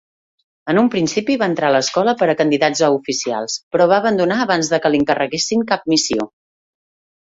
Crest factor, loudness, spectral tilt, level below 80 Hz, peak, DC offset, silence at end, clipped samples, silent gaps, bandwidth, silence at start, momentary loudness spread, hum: 16 dB; -17 LUFS; -4 dB/octave; -58 dBFS; -2 dBFS; under 0.1%; 0.95 s; under 0.1%; 3.63-3.71 s; 7.8 kHz; 0.65 s; 6 LU; none